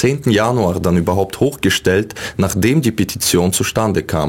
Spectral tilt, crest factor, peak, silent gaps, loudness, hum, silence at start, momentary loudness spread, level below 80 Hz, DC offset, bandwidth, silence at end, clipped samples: -5 dB/octave; 14 dB; -2 dBFS; none; -16 LUFS; none; 0 s; 4 LU; -40 dBFS; under 0.1%; 17 kHz; 0 s; under 0.1%